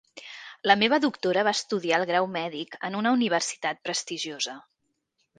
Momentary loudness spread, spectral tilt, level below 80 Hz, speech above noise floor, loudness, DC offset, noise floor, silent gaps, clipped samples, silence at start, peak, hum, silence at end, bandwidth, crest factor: 12 LU; -3 dB/octave; -74 dBFS; 50 dB; -26 LUFS; under 0.1%; -76 dBFS; none; under 0.1%; 0.15 s; -4 dBFS; none; 0.75 s; 10 kHz; 24 dB